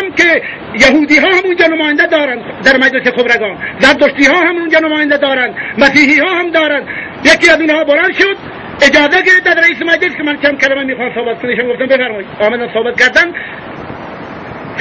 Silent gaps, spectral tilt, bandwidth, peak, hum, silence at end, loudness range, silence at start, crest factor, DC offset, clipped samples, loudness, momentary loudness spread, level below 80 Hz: none; -3.5 dB/octave; 11 kHz; 0 dBFS; none; 0 s; 4 LU; 0 s; 10 dB; under 0.1%; 0.3%; -9 LUFS; 15 LU; -44 dBFS